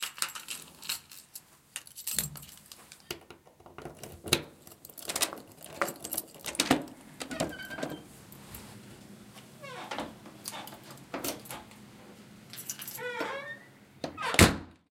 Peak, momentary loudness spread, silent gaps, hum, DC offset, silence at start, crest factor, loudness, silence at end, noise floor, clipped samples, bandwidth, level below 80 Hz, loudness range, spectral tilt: -2 dBFS; 21 LU; none; none; under 0.1%; 0 s; 32 dB; -33 LUFS; 0.15 s; -55 dBFS; under 0.1%; 17 kHz; -52 dBFS; 9 LU; -3 dB/octave